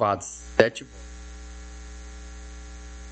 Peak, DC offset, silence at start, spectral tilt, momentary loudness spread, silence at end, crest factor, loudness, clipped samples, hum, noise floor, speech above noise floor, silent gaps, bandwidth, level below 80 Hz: 0 dBFS; under 0.1%; 0 s; -4.5 dB/octave; 20 LU; 0 s; 30 dB; -25 LUFS; under 0.1%; 60 Hz at -40 dBFS; -40 dBFS; 15 dB; none; 8.8 kHz; -42 dBFS